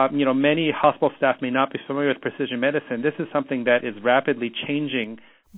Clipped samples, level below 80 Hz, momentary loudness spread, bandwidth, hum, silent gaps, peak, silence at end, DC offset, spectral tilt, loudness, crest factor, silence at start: under 0.1%; -66 dBFS; 7 LU; 4 kHz; none; none; -2 dBFS; 0 s; under 0.1%; -9 dB/octave; -22 LUFS; 20 dB; 0 s